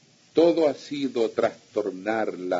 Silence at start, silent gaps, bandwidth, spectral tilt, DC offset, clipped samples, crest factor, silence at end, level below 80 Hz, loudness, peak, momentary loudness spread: 0.35 s; none; 7.8 kHz; -5.5 dB/octave; under 0.1%; under 0.1%; 18 dB; 0 s; -74 dBFS; -25 LUFS; -8 dBFS; 9 LU